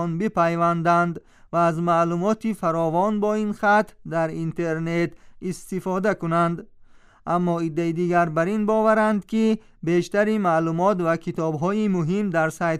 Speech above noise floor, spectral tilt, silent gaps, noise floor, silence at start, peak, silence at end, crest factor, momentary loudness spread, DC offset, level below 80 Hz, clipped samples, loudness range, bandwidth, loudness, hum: 28 dB; -7 dB/octave; none; -50 dBFS; 0 s; -8 dBFS; 0 s; 14 dB; 7 LU; under 0.1%; -54 dBFS; under 0.1%; 4 LU; 13 kHz; -22 LUFS; none